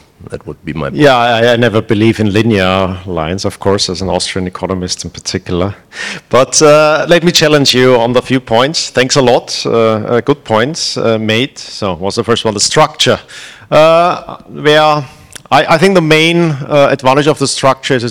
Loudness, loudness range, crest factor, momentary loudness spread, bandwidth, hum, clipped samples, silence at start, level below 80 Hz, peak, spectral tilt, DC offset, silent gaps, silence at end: -10 LUFS; 5 LU; 10 dB; 11 LU; 18 kHz; none; 1%; 0.2 s; -42 dBFS; 0 dBFS; -4 dB/octave; 0.6%; none; 0 s